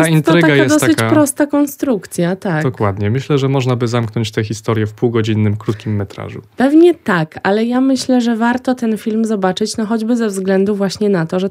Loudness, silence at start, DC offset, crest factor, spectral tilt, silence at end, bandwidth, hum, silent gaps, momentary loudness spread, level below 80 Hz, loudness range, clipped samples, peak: -15 LUFS; 0 s; under 0.1%; 14 dB; -6 dB/octave; 0 s; 16 kHz; none; none; 8 LU; -56 dBFS; 3 LU; under 0.1%; 0 dBFS